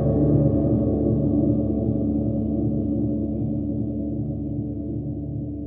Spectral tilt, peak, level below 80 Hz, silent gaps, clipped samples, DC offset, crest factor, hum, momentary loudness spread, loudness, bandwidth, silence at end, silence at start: -15.5 dB/octave; -8 dBFS; -34 dBFS; none; under 0.1%; under 0.1%; 14 dB; none; 10 LU; -24 LUFS; 1.9 kHz; 0 s; 0 s